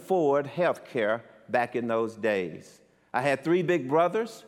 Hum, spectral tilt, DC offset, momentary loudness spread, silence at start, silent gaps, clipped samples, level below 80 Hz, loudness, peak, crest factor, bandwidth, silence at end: none; -6.5 dB/octave; under 0.1%; 7 LU; 0 s; none; under 0.1%; -76 dBFS; -27 LUFS; -12 dBFS; 16 dB; 14.5 kHz; 0.05 s